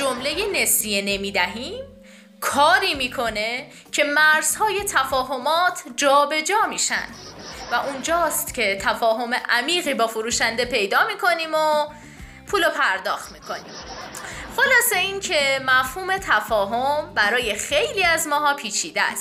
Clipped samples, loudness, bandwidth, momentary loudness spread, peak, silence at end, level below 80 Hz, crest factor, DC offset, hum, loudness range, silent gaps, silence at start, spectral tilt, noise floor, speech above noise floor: under 0.1%; -20 LUFS; 16 kHz; 14 LU; -6 dBFS; 0 s; -50 dBFS; 16 dB; under 0.1%; none; 3 LU; none; 0 s; -1 dB/octave; -46 dBFS; 25 dB